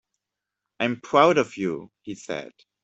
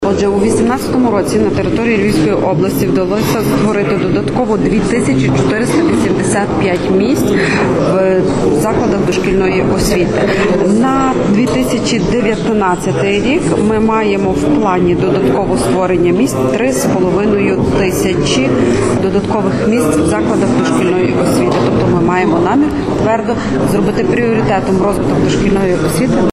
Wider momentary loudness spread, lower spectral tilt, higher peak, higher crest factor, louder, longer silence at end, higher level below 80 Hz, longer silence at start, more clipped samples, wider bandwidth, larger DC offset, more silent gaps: first, 18 LU vs 2 LU; about the same, -5 dB/octave vs -6 dB/octave; about the same, -4 dBFS vs -2 dBFS; first, 22 dB vs 8 dB; second, -23 LUFS vs -12 LUFS; first, 0.4 s vs 0 s; second, -68 dBFS vs -32 dBFS; first, 0.8 s vs 0 s; neither; second, 8.2 kHz vs 13.5 kHz; neither; neither